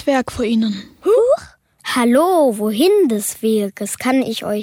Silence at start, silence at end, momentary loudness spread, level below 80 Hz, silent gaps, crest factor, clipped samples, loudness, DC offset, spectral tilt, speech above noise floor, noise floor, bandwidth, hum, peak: 0 s; 0 s; 8 LU; -50 dBFS; none; 12 dB; under 0.1%; -16 LUFS; under 0.1%; -4.5 dB/octave; 25 dB; -41 dBFS; 16.5 kHz; none; -4 dBFS